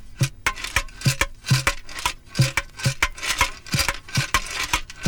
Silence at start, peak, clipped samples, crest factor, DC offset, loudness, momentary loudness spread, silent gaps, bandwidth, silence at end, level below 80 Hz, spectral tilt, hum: 0 s; -4 dBFS; under 0.1%; 20 dB; 0.2%; -23 LUFS; 5 LU; none; over 20 kHz; 0 s; -36 dBFS; -3 dB/octave; none